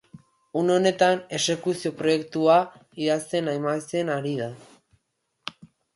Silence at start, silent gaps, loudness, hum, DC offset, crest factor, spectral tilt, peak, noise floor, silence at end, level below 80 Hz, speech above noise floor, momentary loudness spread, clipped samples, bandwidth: 0.15 s; none; -24 LUFS; none; under 0.1%; 18 dB; -4.5 dB/octave; -8 dBFS; -75 dBFS; 0.45 s; -70 dBFS; 51 dB; 15 LU; under 0.1%; 11.5 kHz